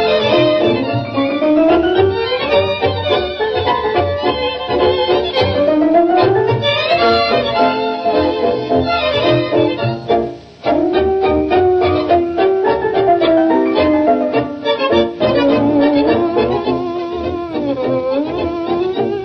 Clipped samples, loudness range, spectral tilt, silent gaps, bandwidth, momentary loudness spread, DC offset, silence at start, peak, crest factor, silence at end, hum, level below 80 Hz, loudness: under 0.1%; 2 LU; -7.5 dB/octave; none; 6.2 kHz; 6 LU; under 0.1%; 0 s; -2 dBFS; 12 dB; 0 s; none; -42 dBFS; -14 LUFS